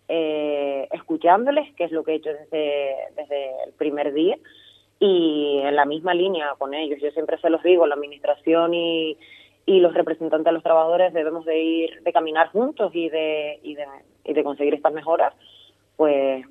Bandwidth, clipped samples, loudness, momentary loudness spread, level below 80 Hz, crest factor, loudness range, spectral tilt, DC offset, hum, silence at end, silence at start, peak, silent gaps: 4 kHz; under 0.1%; -22 LUFS; 11 LU; -74 dBFS; 20 dB; 4 LU; -7 dB/octave; under 0.1%; none; 0.05 s; 0.1 s; -2 dBFS; none